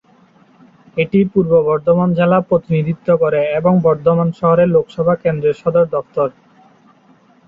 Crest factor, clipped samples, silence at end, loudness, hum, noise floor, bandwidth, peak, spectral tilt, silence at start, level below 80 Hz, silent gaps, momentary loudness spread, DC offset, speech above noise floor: 14 dB; under 0.1%; 1.15 s; -15 LUFS; none; -50 dBFS; 5 kHz; -2 dBFS; -10 dB/octave; 0.95 s; -50 dBFS; none; 5 LU; under 0.1%; 36 dB